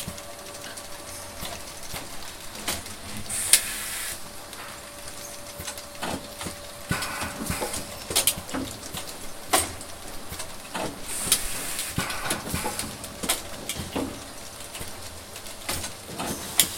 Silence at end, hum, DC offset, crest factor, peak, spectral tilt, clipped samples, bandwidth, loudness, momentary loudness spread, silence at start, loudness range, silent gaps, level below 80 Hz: 0 s; none; under 0.1%; 30 dB; 0 dBFS; -1.5 dB/octave; under 0.1%; 17 kHz; -29 LUFS; 15 LU; 0 s; 6 LU; none; -48 dBFS